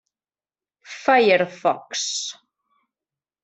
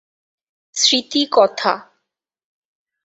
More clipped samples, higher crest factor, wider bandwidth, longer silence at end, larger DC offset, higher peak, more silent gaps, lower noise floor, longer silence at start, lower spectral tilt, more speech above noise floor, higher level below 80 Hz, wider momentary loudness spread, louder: neither; about the same, 20 dB vs 20 dB; about the same, 8.4 kHz vs 8.4 kHz; about the same, 1.1 s vs 1.2 s; neither; about the same, -4 dBFS vs -2 dBFS; neither; first, under -90 dBFS vs -77 dBFS; first, 0.9 s vs 0.75 s; first, -2.5 dB/octave vs -1 dB/octave; first, over 70 dB vs 61 dB; second, -74 dBFS vs -68 dBFS; first, 14 LU vs 11 LU; second, -20 LUFS vs -16 LUFS